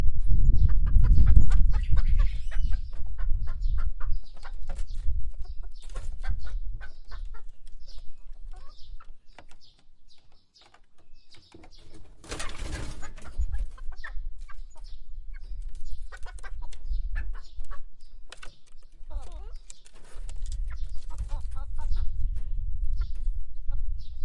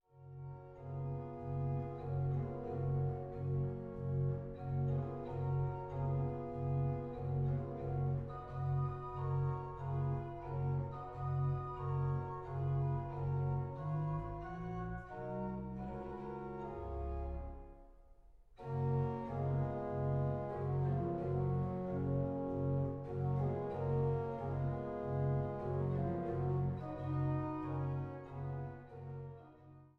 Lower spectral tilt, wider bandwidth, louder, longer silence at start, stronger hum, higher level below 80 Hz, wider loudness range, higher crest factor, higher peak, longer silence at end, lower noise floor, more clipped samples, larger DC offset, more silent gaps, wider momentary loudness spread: second, -6 dB/octave vs -11.5 dB/octave; first, 7.8 kHz vs 3.9 kHz; first, -33 LUFS vs -40 LUFS; second, 0 s vs 0.15 s; neither; first, -28 dBFS vs -54 dBFS; first, 22 LU vs 5 LU; first, 22 dB vs 14 dB; first, 0 dBFS vs -26 dBFS; about the same, 0 s vs 0.1 s; second, -54 dBFS vs -61 dBFS; neither; neither; neither; first, 24 LU vs 8 LU